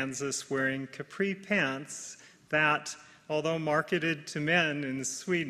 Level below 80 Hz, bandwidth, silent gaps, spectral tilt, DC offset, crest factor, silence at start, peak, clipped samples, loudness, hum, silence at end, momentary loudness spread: -72 dBFS; 14 kHz; none; -4 dB/octave; under 0.1%; 20 dB; 0 s; -12 dBFS; under 0.1%; -30 LUFS; none; 0 s; 15 LU